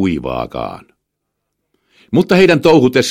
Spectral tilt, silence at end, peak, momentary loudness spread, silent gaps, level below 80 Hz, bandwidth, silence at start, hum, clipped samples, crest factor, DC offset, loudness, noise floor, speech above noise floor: -6 dB/octave; 0 s; 0 dBFS; 15 LU; none; -44 dBFS; 16 kHz; 0 s; 50 Hz at -50 dBFS; under 0.1%; 14 dB; under 0.1%; -12 LUFS; -74 dBFS; 62 dB